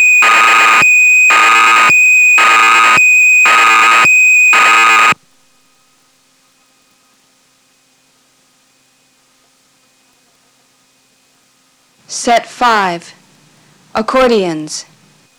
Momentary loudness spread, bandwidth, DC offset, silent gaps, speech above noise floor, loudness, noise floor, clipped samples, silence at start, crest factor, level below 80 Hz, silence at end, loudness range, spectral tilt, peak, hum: 14 LU; over 20 kHz; under 0.1%; none; 40 dB; -6 LUFS; -53 dBFS; under 0.1%; 0 s; 6 dB; -52 dBFS; 0.55 s; 13 LU; -1 dB/octave; -4 dBFS; none